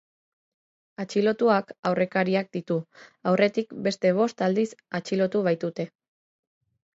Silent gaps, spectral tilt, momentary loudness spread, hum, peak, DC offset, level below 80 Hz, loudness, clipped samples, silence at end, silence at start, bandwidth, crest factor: 1.79-1.83 s; -6.5 dB/octave; 9 LU; none; -8 dBFS; under 0.1%; -74 dBFS; -25 LUFS; under 0.1%; 1.05 s; 1 s; 8 kHz; 18 dB